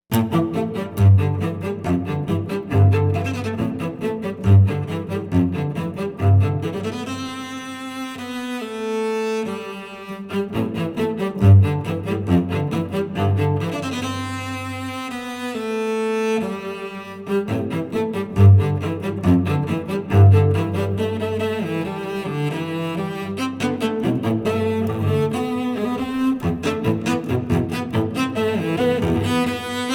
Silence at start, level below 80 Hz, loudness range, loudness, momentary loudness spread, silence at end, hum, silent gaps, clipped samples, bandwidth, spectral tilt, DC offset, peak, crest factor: 0.1 s; -46 dBFS; 6 LU; -21 LUFS; 12 LU; 0 s; none; none; under 0.1%; 15 kHz; -7.5 dB/octave; under 0.1%; -2 dBFS; 18 dB